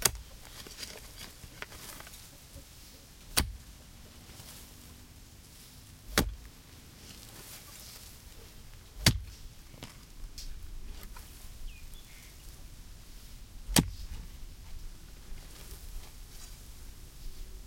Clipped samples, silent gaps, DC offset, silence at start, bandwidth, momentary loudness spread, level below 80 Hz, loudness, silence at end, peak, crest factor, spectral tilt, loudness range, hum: under 0.1%; none; under 0.1%; 0 s; 16.5 kHz; 21 LU; -46 dBFS; -36 LUFS; 0 s; -4 dBFS; 36 dB; -3 dB/octave; 13 LU; none